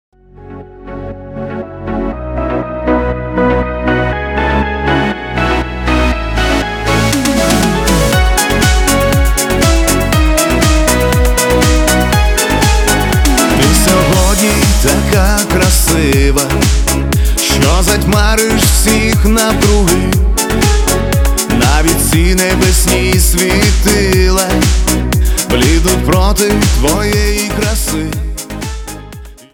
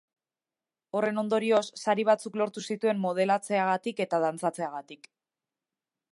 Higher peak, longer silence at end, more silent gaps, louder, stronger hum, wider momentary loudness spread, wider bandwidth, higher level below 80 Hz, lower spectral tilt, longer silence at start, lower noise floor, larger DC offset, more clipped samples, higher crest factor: first, 0 dBFS vs -10 dBFS; second, 0.2 s vs 1.15 s; neither; first, -11 LUFS vs -28 LUFS; neither; first, 9 LU vs 6 LU; first, 19.5 kHz vs 11.5 kHz; first, -16 dBFS vs -84 dBFS; about the same, -4 dB/octave vs -5 dB/octave; second, 0.4 s vs 0.95 s; second, -31 dBFS vs under -90 dBFS; neither; neither; second, 10 dB vs 20 dB